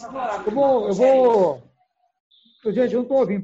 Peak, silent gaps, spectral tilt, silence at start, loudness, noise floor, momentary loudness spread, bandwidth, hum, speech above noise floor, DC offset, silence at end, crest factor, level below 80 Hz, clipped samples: -6 dBFS; 2.20-2.31 s; -7 dB/octave; 0 s; -19 LUFS; -66 dBFS; 11 LU; 7.8 kHz; none; 48 dB; under 0.1%; 0 s; 14 dB; -60 dBFS; under 0.1%